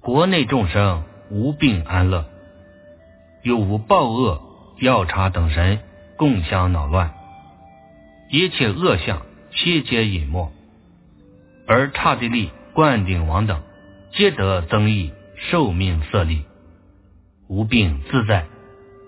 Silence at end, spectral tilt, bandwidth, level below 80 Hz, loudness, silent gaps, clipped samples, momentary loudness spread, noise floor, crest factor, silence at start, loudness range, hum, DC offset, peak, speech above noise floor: 0.6 s; -10.5 dB/octave; 4 kHz; -30 dBFS; -19 LUFS; none; under 0.1%; 11 LU; -51 dBFS; 20 dB; 0.05 s; 3 LU; none; under 0.1%; 0 dBFS; 33 dB